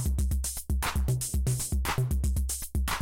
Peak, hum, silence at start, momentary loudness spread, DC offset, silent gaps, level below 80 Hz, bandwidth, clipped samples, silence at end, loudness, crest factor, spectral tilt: -18 dBFS; none; 0 s; 2 LU; under 0.1%; none; -30 dBFS; 17 kHz; under 0.1%; 0 s; -30 LUFS; 10 dB; -4 dB/octave